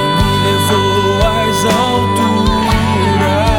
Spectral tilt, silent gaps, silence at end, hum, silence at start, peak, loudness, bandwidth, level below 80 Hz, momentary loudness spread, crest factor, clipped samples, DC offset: -5 dB/octave; none; 0 s; none; 0 s; 0 dBFS; -12 LUFS; 17 kHz; -24 dBFS; 1 LU; 12 dB; under 0.1%; 0.4%